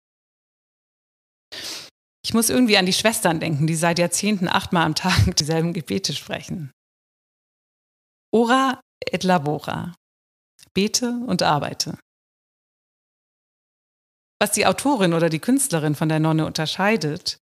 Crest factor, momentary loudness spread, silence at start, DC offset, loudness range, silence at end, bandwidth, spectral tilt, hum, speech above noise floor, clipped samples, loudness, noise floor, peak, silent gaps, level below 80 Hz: 20 dB; 13 LU; 1.5 s; under 0.1%; 7 LU; 0.1 s; 15.5 kHz; -4 dB/octave; none; over 70 dB; under 0.1%; -21 LUFS; under -90 dBFS; -2 dBFS; 1.91-2.23 s, 6.73-8.32 s, 8.82-9.01 s, 9.97-10.59 s, 10.71-10.75 s, 12.02-14.40 s; -46 dBFS